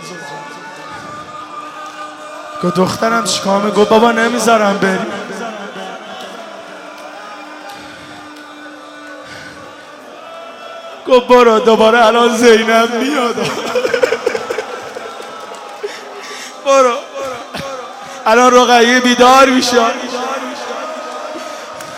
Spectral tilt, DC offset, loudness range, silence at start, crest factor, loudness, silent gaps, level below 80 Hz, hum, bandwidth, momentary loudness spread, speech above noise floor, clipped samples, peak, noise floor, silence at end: -3.5 dB/octave; under 0.1%; 20 LU; 0 s; 14 dB; -12 LUFS; none; -54 dBFS; none; 16 kHz; 23 LU; 24 dB; under 0.1%; 0 dBFS; -34 dBFS; 0 s